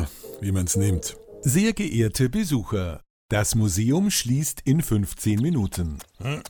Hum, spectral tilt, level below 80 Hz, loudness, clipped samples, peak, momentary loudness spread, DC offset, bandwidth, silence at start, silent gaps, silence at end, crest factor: none; -5 dB/octave; -40 dBFS; -24 LUFS; under 0.1%; -8 dBFS; 11 LU; under 0.1%; over 20 kHz; 0 s; 3.10-3.29 s; 0 s; 16 dB